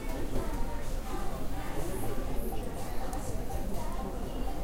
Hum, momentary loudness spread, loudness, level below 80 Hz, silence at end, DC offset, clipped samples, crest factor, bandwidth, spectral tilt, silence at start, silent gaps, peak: none; 2 LU; -38 LUFS; -36 dBFS; 0 s; under 0.1%; under 0.1%; 12 dB; 16 kHz; -5.5 dB/octave; 0 s; none; -18 dBFS